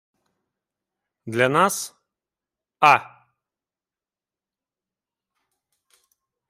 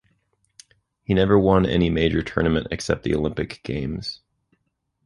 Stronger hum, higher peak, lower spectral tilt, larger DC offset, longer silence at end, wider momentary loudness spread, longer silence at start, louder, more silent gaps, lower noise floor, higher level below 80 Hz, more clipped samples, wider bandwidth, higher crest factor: neither; about the same, -2 dBFS vs -4 dBFS; second, -3.5 dB/octave vs -6.5 dB/octave; neither; first, 3.45 s vs 0.9 s; about the same, 13 LU vs 13 LU; first, 1.25 s vs 1.1 s; first, -19 LUFS vs -22 LUFS; neither; first, under -90 dBFS vs -73 dBFS; second, -76 dBFS vs -38 dBFS; neither; first, 16 kHz vs 11.5 kHz; first, 26 dB vs 20 dB